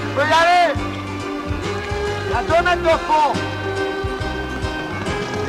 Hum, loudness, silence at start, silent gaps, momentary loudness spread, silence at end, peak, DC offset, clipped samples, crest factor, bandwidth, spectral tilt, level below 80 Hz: none; -19 LUFS; 0 s; none; 10 LU; 0 s; -6 dBFS; under 0.1%; under 0.1%; 14 dB; 15 kHz; -5 dB/octave; -34 dBFS